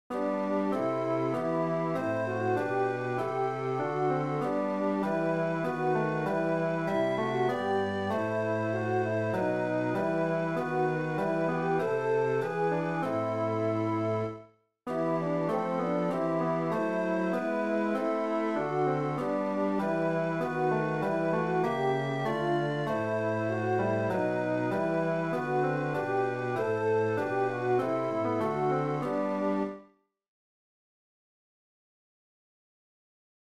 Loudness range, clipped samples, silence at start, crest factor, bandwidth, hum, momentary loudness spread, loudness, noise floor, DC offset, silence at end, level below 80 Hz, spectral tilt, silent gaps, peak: 2 LU; under 0.1%; 0.1 s; 12 dB; 13 kHz; none; 2 LU; -30 LUFS; -60 dBFS; 0.1%; 3.7 s; -72 dBFS; -8 dB/octave; none; -16 dBFS